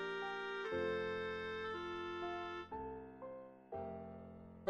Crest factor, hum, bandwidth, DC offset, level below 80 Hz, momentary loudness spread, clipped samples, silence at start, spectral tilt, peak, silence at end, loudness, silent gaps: 20 dB; none; 9.6 kHz; under 0.1%; -70 dBFS; 12 LU; under 0.1%; 0 s; -6 dB/octave; -24 dBFS; 0 s; -44 LUFS; none